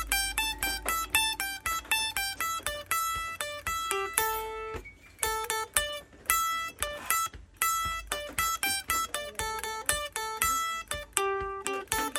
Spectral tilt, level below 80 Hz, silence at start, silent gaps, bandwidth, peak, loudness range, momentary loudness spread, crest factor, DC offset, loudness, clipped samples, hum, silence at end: -0.5 dB/octave; -50 dBFS; 0 s; none; 16.5 kHz; 0 dBFS; 2 LU; 7 LU; 30 dB; under 0.1%; -30 LUFS; under 0.1%; none; 0 s